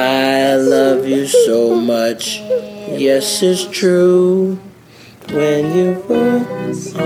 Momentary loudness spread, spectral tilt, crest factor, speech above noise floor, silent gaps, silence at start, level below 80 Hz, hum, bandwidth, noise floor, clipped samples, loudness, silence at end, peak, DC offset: 9 LU; -4.5 dB/octave; 12 dB; 27 dB; none; 0 s; -60 dBFS; none; 16 kHz; -41 dBFS; under 0.1%; -14 LUFS; 0 s; -2 dBFS; under 0.1%